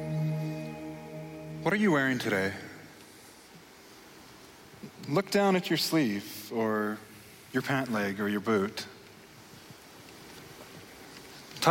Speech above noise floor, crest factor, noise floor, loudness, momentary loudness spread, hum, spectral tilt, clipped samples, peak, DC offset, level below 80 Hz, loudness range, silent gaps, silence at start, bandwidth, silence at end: 24 dB; 22 dB; -53 dBFS; -30 LUFS; 24 LU; none; -5 dB/octave; under 0.1%; -10 dBFS; under 0.1%; -68 dBFS; 6 LU; none; 0 s; 16.5 kHz; 0 s